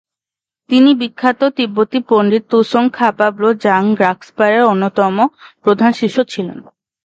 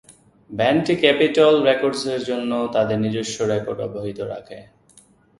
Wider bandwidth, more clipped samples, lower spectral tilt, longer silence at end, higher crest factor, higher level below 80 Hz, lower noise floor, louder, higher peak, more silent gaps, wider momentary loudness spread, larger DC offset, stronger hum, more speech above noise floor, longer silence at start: second, 7.8 kHz vs 11.5 kHz; neither; first, -6.5 dB/octave vs -5 dB/octave; second, 0.45 s vs 0.75 s; second, 14 dB vs 20 dB; second, -64 dBFS vs -58 dBFS; first, -88 dBFS vs -54 dBFS; first, -14 LUFS vs -20 LUFS; about the same, 0 dBFS vs 0 dBFS; neither; second, 5 LU vs 14 LU; neither; neither; first, 75 dB vs 34 dB; first, 0.7 s vs 0.5 s